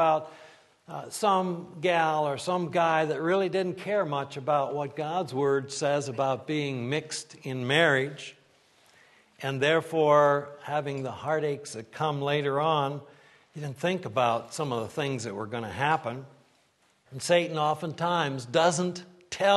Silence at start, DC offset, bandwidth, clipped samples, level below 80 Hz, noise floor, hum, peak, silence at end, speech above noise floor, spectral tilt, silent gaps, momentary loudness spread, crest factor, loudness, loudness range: 0 s; under 0.1%; 12.5 kHz; under 0.1%; -72 dBFS; -67 dBFS; none; -8 dBFS; 0 s; 39 dB; -4.5 dB/octave; none; 12 LU; 20 dB; -28 LUFS; 4 LU